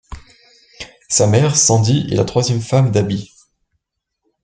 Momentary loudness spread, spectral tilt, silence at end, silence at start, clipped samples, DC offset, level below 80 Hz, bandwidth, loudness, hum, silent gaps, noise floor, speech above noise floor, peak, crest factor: 17 LU; -4.5 dB/octave; 1.2 s; 0.1 s; under 0.1%; under 0.1%; -44 dBFS; 9.6 kHz; -15 LUFS; none; none; -75 dBFS; 61 dB; 0 dBFS; 16 dB